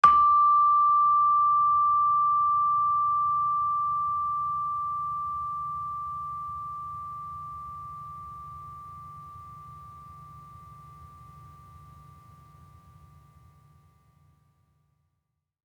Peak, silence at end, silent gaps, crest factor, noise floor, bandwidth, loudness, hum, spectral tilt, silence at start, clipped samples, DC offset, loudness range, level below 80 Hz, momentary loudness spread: -6 dBFS; 4 s; none; 22 dB; -80 dBFS; 6.4 kHz; -24 LUFS; none; -5 dB/octave; 0.05 s; under 0.1%; under 0.1%; 24 LU; -62 dBFS; 24 LU